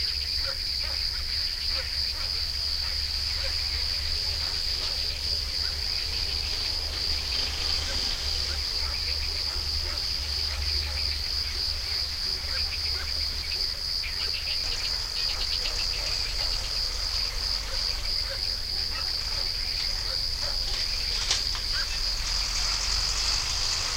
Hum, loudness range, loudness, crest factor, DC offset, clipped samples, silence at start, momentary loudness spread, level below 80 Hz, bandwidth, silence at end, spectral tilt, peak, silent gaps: none; 1 LU; -26 LUFS; 18 dB; under 0.1%; under 0.1%; 0 s; 2 LU; -36 dBFS; 16 kHz; 0 s; -1 dB/octave; -10 dBFS; none